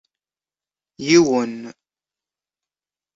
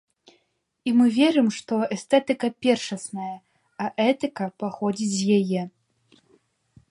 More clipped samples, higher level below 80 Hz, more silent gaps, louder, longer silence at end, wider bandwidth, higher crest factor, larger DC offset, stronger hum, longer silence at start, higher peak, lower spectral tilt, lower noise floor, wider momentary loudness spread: neither; first, -64 dBFS vs -72 dBFS; neither; first, -17 LUFS vs -24 LUFS; first, 1.45 s vs 1.2 s; second, 7.6 kHz vs 11.5 kHz; about the same, 20 dB vs 18 dB; neither; neither; first, 1 s vs 0.85 s; first, -2 dBFS vs -6 dBFS; about the same, -4.5 dB/octave vs -5 dB/octave; first, under -90 dBFS vs -71 dBFS; first, 21 LU vs 13 LU